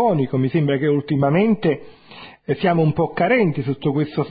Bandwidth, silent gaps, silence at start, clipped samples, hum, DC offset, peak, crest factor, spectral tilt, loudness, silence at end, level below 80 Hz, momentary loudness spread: 5 kHz; none; 0 s; under 0.1%; none; under 0.1%; -4 dBFS; 14 dB; -12.5 dB/octave; -19 LUFS; 0 s; -52 dBFS; 7 LU